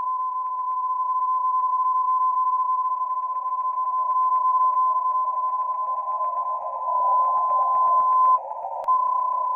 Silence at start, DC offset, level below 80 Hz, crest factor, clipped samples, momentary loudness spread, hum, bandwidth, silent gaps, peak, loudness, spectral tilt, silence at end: 0 s; under 0.1%; -80 dBFS; 12 dB; under 0.1%; 7 LU; none; 2.6 kHz; none; -12 dBFS; -22 LUFS; -4.5 dB/octave; 0 s